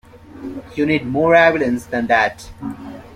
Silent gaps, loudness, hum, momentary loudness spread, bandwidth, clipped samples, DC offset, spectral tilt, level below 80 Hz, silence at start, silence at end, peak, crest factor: none; -16 LUFS; none; 20 LU; 14.5 kHz; under 0.1%; under 0.1%; -6 dB/octave; -48 dBFS; 0.15 s; 0 s; -2 dBFS; 16 dB